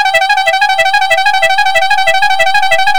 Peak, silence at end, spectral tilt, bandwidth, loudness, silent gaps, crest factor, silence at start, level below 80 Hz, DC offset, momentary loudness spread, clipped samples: 0 dBFS; 0 s; 1 dB/octave; over 20 kHz; -9 LUFS; none; 10 dB; 0 s; -42 dBFS; under 0.1%; 1 LU; 2%